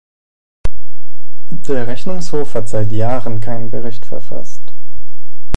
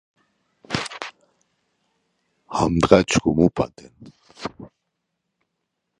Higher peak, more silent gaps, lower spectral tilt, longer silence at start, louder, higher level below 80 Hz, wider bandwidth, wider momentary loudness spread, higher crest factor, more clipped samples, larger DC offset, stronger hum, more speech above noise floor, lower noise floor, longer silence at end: about the same, 0 dBFS vs 0 dBFS; neither; first, -7 dB/octave vs -5.5 dB/octave; about the same, 0.65 s vs 0.7 s; second, -24 LUFS vs -20 LUFS; first, -32 dBFS vs -44 dBFS; first, 16 kHz vs 11.5 kHz; second, 14 LU vs 19 LU; about the same, 20 dB vs 24 dB; first, 0.5% vs under 0.1%; first, 70% vs under 0.1%; neither; second, 28 dB vs 58 dB; second, -50 dBFS vs -78 dBFS; second, 0.15 s vs 1.35 s